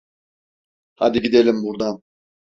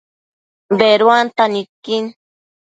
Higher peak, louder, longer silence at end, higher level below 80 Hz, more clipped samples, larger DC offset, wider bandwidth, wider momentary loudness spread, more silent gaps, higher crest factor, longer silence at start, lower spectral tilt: about the same, -2 dBFS vs 0 dBFS; second, -19 LUFS vs -14 LUFS; about the same, 0.5 s vs 0.5 s; first, -56 dBFS vs -66 dBFS; neither; neither; second, 7.4 kHz vs 9 kHz; about the same, 10 LU vs 12 LU; second, none vs 1.69-1.83 s; about the same, 18 dB vs 16 dB; first, 1 s vs 0.7 s; about the same, -6 dB/octave vs -5 dB/octave